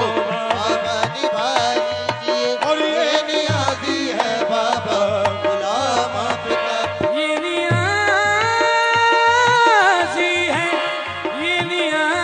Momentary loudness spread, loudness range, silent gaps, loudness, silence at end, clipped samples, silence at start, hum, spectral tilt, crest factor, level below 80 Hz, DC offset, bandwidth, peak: 7 LU; 4 LU; none; -18 LUFS; 0 s; under 0.1%; 0 s; none; -3.5 dB/octave; 16 dB; -60 dBFS; under 0.1%; 10.5 kHz; -2 dBFS